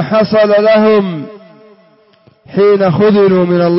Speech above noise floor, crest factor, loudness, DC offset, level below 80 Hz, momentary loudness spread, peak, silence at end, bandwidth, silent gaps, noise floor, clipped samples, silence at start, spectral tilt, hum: 39 dB; 8 dB; -10 LUFS; under 0.1%; -52 dBFS; 12 LU; -2 dBFS; 0 s; 5.8 kHz; none; -48 dBFS; under 0.1%; 0 s; -11 dB/octave; none